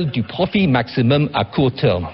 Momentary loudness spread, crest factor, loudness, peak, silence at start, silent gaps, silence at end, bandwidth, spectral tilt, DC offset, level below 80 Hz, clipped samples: 4 LU; 12 dB; -18 LUFS; -4 dBFS; 0 s; none; 0 s; 5.8 kHz; -10.5 dB/octave; under 0.1%; -40 dBFS; under 0.1%